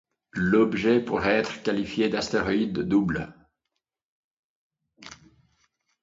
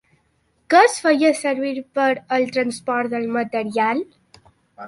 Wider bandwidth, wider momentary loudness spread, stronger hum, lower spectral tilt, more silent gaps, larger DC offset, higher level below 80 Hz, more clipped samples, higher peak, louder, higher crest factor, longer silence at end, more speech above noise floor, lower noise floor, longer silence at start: second, 7.8 kHz vs 11.5 kHz; first, 17 LU vs 9 LU; neither; first, -6 dB/octave vs -3.5 dB/octave; first, 4.03-4.70 s vs none; neither; first, -54 dBFS vs -68 dBFS; neither; second, -8 dBFS vs -2 dBFS; second, -25 LUFS vs -19 LUFS; about the same, 20 dB vs 18 dB; first, 0.9 s vs 0 s; first, 59 dB vs 45 dB; first, -83 dBFS vs -64 dBFS; second, 0.35 s vs 0.7 s